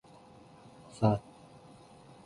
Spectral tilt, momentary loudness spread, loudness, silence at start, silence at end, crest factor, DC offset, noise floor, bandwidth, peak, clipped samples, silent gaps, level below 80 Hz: -8.5 dB/octave; 26 LU; -31 LUFS; 1 s; 1.05 s; 24 dB; under 0.1%; -56 dBFS; 11.5 kHz; -12 dBFS; under 0.1%; none; -62 dBFS